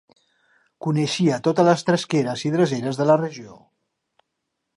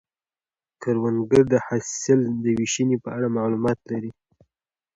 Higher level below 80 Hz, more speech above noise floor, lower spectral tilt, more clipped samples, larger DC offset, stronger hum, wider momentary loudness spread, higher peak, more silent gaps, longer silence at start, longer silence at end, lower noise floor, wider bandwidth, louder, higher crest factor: second, -68 dBFS vs -58 dBFS; second, 58 dB vs over 68 dB; about the same, -6 dB/octave vs -5.5 dB/octave; neither; neither; neither; second, 8 LU vs 11 LU; about the same, -2 dBFS vs -4 dBFS; neither; about the same, 0.8 s vs 0.8 s; first, 1.25 s vs 0.85 s; second, -79 dBFS vs under -90 dBFS; first, 11.5 kHz vs 9.4 kHz; about the same, -21 LUFS vs -23 LUFS; about the same, 20 dB vs 20 dB